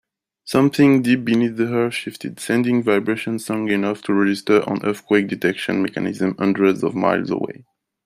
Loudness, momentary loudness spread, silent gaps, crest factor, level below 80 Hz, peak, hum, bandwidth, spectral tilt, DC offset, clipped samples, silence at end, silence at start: -19 LUFS; 8 LU; none; 18 dB; -62 dBFS; -2 dBFS; none; 15.5 kHz; -6 dB/octave; under 0.1%; under 0.1%; 0.55 s; 0.45 s